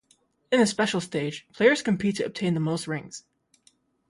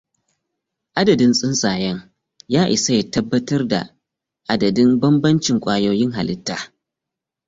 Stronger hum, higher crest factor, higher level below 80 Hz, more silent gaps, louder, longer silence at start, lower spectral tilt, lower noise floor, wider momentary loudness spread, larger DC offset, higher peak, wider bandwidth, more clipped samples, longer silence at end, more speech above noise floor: neither; about the same, 20 dB vs 16 dB; second, -66 dBFS vs -52 dBFS; neither; second, -25 LUFS vs -18 LUFS; second, 0.5 s vs 0.95 s; about the same, -5 dB/octave vs -5 dB/octave; second, -66 dBFS vs -84 dBFS; about the same, 12 LU vs 12 LU; neither; about the same, -6 dBFS vs -4 dBFS; first, 11.5 kHz vs 7.8 kHz; neither; about the same, 0.9 s vs 0.8 s; second, 41 dB vs 67 dB